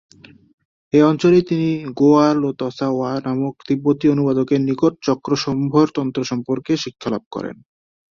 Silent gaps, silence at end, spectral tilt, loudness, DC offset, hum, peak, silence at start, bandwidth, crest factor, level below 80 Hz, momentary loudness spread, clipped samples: 7.26-7.31 s; 0.6 s; -7 dB/octave; -18 LUFS; under 0.1%; none; -2 dBFS; 0.95 s; 7.4 kHz; 16 dB; -58 dBFS; 10 LU; under 0.1%